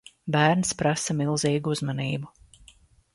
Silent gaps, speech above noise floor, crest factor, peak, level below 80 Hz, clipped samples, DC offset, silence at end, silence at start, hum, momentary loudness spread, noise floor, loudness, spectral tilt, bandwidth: none; 32 dB; 20 dB; -6 dBFS; -58 dBFS; under 0.1%; under 0.1%; 0.85 s; 0.25 s; none; 9 LU; -56 dBFS; -25 LUFS; -4.5 dB/octave; 11.5 kHz